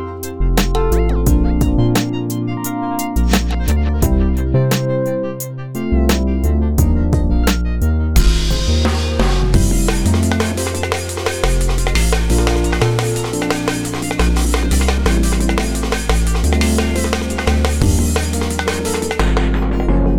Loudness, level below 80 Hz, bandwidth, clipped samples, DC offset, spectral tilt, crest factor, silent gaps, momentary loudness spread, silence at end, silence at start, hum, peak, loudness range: -17 LUFS; -18 dBFS; over 20 kHz; under 0.1%; 2%; -5.5 dB/octave; 14 dB; none; 5 LU; 0 s; 0 s; none; 0 dBFS; 1 LU